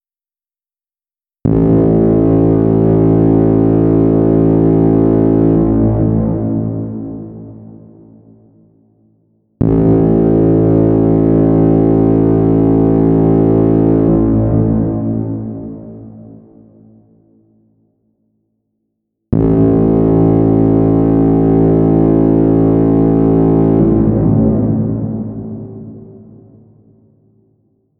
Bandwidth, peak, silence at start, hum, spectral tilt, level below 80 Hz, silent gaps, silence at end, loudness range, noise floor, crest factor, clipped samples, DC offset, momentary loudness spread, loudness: 3 kHz; 0 dBFS; 1.45 s; none; -14 dB/octave; -30 dBFS; none; 1.9 s; 11 LU; under -90 dBFS; 12 dB; under 0.1%; under 0.1%; 12 LU; -11 LUFS